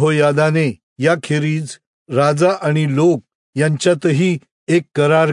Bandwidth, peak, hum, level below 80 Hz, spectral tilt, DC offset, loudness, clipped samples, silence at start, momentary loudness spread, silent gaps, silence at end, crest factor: 11 kHz; -2 dBFS; none; -64 dBFS; -6.5 dB/octave; under 0.1%; -16 LUFS; under 0.1%; 0 s; 8 LU; 0.83-0.96 s, 1.87-2.06 s, 3.35-3.53 s, 4.52-4.67 s; 0 s; 14 dB